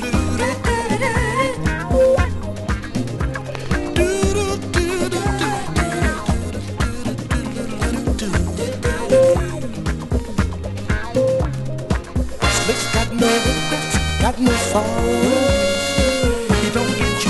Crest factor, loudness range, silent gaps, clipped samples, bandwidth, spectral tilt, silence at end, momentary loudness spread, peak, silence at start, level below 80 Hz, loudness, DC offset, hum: 18 dB; 4 LU; none; under 0.1%; 12 kHz; -5 dB/octave; 0 s; 8 LU; 0 dBFS; 0 s; -26 dBFS; -19 LUFS; under 0.1%; none